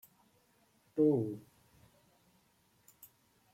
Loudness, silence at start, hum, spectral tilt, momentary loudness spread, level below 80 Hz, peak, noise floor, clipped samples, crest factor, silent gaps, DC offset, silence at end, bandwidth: -33 LUFS; 0.95 s; none; -9.5 dB/octave; 28 LU; -80 dBFS; -20 dBFS; -72 dBFS; under 0.1%; 20 dB; none; under 0.1%; 2.15 s; 16.5 kHz